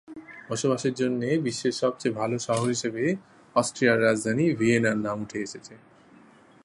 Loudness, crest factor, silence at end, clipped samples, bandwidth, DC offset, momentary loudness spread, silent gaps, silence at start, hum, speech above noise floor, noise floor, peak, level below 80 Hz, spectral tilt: -26 LUFS; 20 dB; 0.85 s; under 0.1%; 11.5 kHz; under 0.1%; 12 LU; none; 0.1 s; none; 29 dB; -54 dBFS; -6 dBFS; -66 dBFS; -5 dB/octave